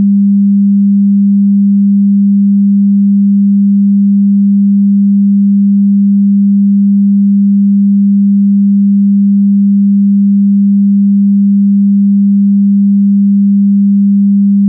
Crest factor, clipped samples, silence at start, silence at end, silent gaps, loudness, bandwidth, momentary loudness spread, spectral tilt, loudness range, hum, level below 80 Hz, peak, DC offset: 4 dB; under 0.1%; 0 s; 0 s; none; -8 LUFS; 0.3 kHz; 0 LU; -18 dB/octave; 0 LU; none; -74 dBFS; -4 dBFS; under 0.1%